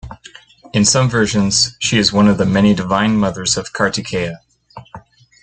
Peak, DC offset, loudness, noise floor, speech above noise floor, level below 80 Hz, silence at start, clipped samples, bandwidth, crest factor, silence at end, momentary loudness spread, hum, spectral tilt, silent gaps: 0 dBFS; under 0.1%; -15 LUFS; -42 dBFS; 27 dB; -42 dBFS; 0.05 s; under 0.1%; 9.4 kHz; 16 dB; 0.45 s; 9 LU; none; -4 dB/octave; none